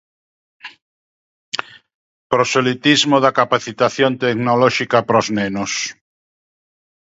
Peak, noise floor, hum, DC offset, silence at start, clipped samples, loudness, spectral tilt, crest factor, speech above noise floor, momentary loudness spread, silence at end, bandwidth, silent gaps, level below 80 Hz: 0 dBFS; under -90 dBFS; none; under 0.1%; 0.65 s; under 0.1%; -16 LUFS; -4 dB/octave; 18 dB; over 74 dB; 12 LU; 1.25 s; 8 kHz; 0.82-1.52 s, 1.94-2.30 s; -58 dBFS